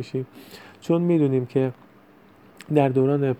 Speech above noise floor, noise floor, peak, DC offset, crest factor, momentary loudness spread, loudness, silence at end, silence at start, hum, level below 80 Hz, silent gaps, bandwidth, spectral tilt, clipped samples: 30 dB; -52 dBFS; -4 dBFS; under 0.1%; 18 dB; 18 LU; -22 LUFS; 0.05 s; 0 s; none; -68 dBFS; none; 13.5 kHz; -9 dB/octave; under 0.1%